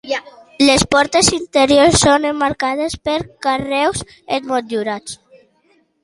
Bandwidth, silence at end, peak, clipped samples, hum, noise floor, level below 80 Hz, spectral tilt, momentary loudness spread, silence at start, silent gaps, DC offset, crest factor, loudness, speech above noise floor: 11.5 kHz; 0.9 s; 0 dBFS; under 0.1%; none; -58 dBFS; -40 dBFS; -3 dB/octave; 13 LU; 0.05 s; none; under 0.1%; 16 dB; -15 LUFS; 43 dB